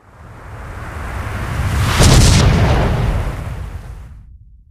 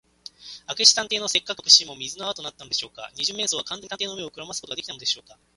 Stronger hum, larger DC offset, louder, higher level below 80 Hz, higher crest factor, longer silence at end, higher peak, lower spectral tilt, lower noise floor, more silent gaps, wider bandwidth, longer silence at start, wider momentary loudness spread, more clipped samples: neither; neither; first, -15 LUFS vs -21 LUFS; first, -20 dBFS vs -66 dBFS; second, 16 dB vs 26 dB; about the same, 0.35 s vs 0.35 s; about the same, 0 dBFS vs 0 dBFS; first, -5 dB/octave vs 0.5 dB/octave; second, -40 dBFS vs -44 dBFS; neither; first, 16 kHz vs 11.5 kHz; second, 0.2 s vs 0.4 s; first, 23 LU vs 18 LU; neither